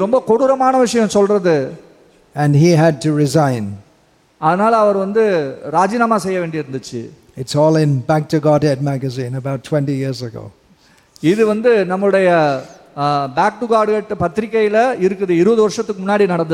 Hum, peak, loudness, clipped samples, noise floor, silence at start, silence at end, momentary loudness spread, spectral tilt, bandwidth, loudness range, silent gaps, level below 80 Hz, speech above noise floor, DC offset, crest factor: none; -2 dBFS; -15 LUFS; under 0.1%; -54 dBFS; 0 s; 0 s; 12 LU; -6.5 dB/octave; 14 kHz; 3 LU; none; -54 dBFS; 39 dB; under 0.1%; 14 dB